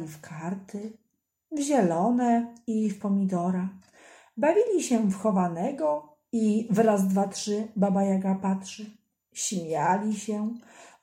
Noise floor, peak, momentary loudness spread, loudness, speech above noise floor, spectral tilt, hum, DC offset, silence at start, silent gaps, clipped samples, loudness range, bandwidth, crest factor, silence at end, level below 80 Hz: -52 dBFS; -10 dBFS; 15 LU; -27 LUFS; 26 dB; -6 dB/octave; none; under 0.1%; 0 s; none; under 0.1%; 3 LU; 15.5 kHz; 16 dB; 0.15 s; -74 dBFS